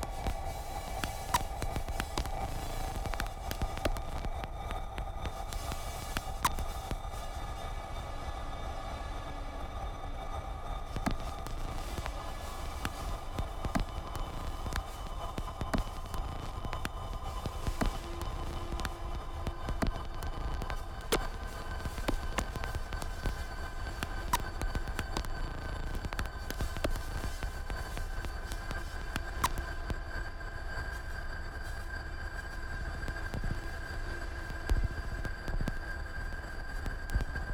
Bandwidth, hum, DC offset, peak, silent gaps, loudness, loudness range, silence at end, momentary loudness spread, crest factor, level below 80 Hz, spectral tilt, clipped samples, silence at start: 19.5 kHz; none; under 0.1%; -14 dBFS; none; -39 LUFS; 3 LU; 0 s; 7 LU; 22 dB; -38 dBFS; -4.5 dB/octave; under 0.1%; 0 s